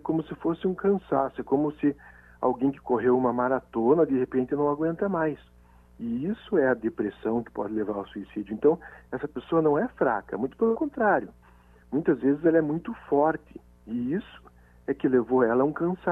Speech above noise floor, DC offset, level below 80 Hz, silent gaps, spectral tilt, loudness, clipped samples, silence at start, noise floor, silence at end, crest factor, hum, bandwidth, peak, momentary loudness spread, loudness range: 29 dB; under 0.1%; -58 dBFS; none; -10 dB/octave; -26 LUFS; under 0.1%; 0.05 s; -55 dBFS; 0 s; 16 dB; 60 Hz at -55 dBFS; 3.9 kHz; -10 dBFS; 11 LU; 3 LU